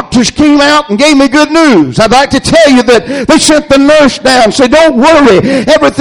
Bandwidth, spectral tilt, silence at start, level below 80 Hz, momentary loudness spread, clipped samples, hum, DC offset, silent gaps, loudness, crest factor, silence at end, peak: 13 kHz; -4 dB/octave; 0 s; -32 dBFS; 3 LU; 3%; none; under 0.1%; none; -5 LUFS; 4 dB; 0 s; 0 dBFS